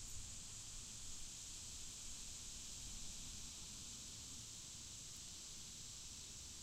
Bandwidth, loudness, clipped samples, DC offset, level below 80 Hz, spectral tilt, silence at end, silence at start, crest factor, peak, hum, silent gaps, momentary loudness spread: 16 kHz; -51 LUFS; under 0.1%; under 0.1%; -60 dBFS; -1 dB/octave; 0 s; 0 s; 14 dB; -38 dBFS; none; none; 1 LU